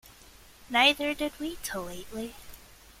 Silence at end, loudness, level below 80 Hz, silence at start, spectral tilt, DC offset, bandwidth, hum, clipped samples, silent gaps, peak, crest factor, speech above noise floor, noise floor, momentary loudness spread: 0.25 s; -28 LUFS; -56 dBFS; 0.05 s; -2 dB/octave; under 0.1%; 16.5 kHz; none; under 0.1%; none; -8 dBFS; 24 dB; 24 dB; -54 dBFS; 17 LU